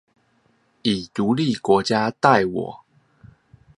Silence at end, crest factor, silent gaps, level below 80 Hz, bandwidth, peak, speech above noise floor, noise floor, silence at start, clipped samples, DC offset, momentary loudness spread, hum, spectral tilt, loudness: 1 s; 22 dB; none; -58 dBFS; 11 kHz; 0 dBFS; 43 dB; -63 dBFS; 0.85 s; under 0.1%; under 0.1%; 10 LU; none; -5.5 dB/octave; -20 LUFS